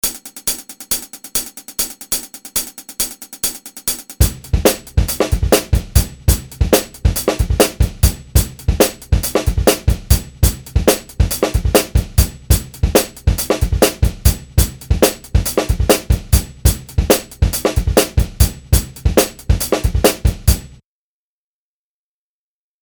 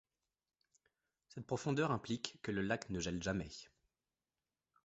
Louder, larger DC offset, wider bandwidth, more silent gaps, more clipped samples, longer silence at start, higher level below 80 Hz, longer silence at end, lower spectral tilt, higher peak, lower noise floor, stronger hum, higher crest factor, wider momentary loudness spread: first, -17 LUFS vs -40 LUFS; neither; first, over 20 kHz vs 8 kHz; neither; neither; second, 0.05 s vs 1.35 s; first, -20 dBFS vs -64 dBFS; first, 2.15 s vs 1.2 s; about the same, -4.5 dB/octave vs -5 dB/octave; first, 0 dBFS vs -18 dBFS; about the same, under -90 dBFS vs under -90 dBFS; neither; second, 16 dB vs 26 dB; second, 6 LU vs 15 LU